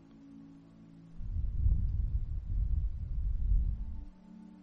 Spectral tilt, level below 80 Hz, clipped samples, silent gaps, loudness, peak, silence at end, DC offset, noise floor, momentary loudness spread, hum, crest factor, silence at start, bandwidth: -10.5 dB/octave; -34 dBFS; under 0.1%; none; -36 LUFS; -18 dBFS; 0 s; under 0.1%; -55 dBFS; 21 LU; none; 16 dB; 0.1 s; 1.6 kHz